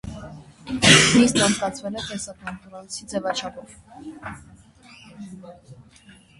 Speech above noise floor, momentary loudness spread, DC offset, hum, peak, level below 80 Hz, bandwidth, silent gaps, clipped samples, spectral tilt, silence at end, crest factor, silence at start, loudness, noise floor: 28 dB; 28 LU; under 0.1%; none; 0 dBFS; -48 dBFS; 11.5 kHz; none; under 0.1%; -3 dB/octave; 0.65 s; 24 dB; 0.05 s; -19 LUFS; -51 dBFS